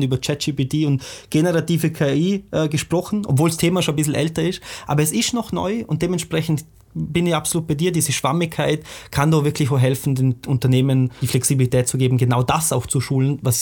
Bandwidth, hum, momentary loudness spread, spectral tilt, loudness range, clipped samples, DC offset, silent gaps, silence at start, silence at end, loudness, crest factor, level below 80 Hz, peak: 19 kHz; none; 6 LU; -5.5 dB/octave; 3 LU; under 0.1%; under 0.1%; none; 0 s; 0 s; -20 LUFS; 16 dB; -46 dBFS; -2 dBFS